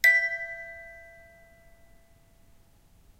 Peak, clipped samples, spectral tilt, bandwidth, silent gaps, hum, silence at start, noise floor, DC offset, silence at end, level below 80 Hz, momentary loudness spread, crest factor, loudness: -8 dBFS; under 0.1%; 0 dB/octave; 16 kHz; none; none; 0.05 s; -59 dBFS; under 0.1%; 2.2 s; -62 dBFS; 27 LU; 24 dB; -27 LUFS